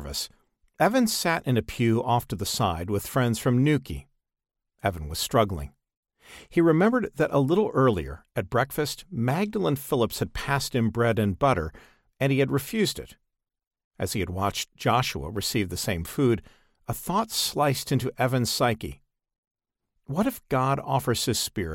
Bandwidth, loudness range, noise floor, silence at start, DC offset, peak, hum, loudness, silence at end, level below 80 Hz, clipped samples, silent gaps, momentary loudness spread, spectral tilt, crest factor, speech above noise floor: 17 kHz; 3 LU; -77 dBFS; 0 s; under 0.1%; -8 dBFS; none; -26 LUFS; 0 s; -48 dBFS; under 0.1%; 5.97-6.03 s, 13.67-13.71 s, 13.84-13.91 s, 19.38-19.43 s, 19.51-19.55 s; 9 LU; -5 dB/octave; 18 dB; 52 dB